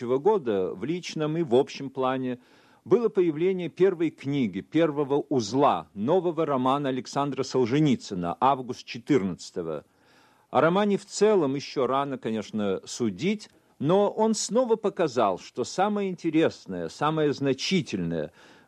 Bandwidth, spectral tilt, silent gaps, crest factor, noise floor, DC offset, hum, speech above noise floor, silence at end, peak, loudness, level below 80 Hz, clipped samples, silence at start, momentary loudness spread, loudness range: 10.5 kHz; -5.5 dB/octave; none; 18 dB; -60 dBFS; under 0.1%; none; 34 dB; 0.4 s; -8 dBFS; -26 LUFS; -68 dBFS; under 0.1%; 0 s; 9 LU; 2 LU